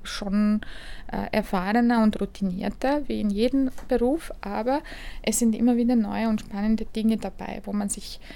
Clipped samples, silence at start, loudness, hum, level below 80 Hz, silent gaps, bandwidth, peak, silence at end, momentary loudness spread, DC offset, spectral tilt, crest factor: under 0.1%; 0 s; -25 LUFS; none; -40 dBFS; none; 19 kHz; -8 dBFS; 0 s; 11 LU; under 0.1%; -5 dB/octave; 16 dB